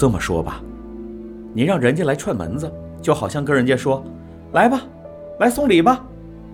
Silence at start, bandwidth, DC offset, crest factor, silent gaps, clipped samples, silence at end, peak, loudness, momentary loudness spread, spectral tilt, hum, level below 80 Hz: 0 s; 16.5 kHz; under 0.1%; 18 dB; none; under 0.1%; 0 s; -2 dBFS; -19 LUFS; 21 LU; -6 dB/octave; none; -42 dBFS